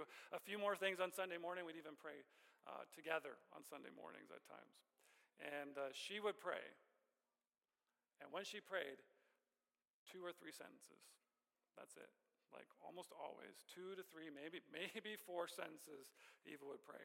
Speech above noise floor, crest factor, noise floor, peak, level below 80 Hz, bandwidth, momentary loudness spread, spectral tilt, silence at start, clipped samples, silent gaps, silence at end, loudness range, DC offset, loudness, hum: over 38 dB; 24 dB; under -90 dBFS; -30 dBFS; under -90 dBFS; 16.5 kHz; 18 LU; -3 dB/octave; 0 s; under 0.1%; 9.90-10.06 s; 0 s; 12 LU; under 0.1%; -51 LUFS; none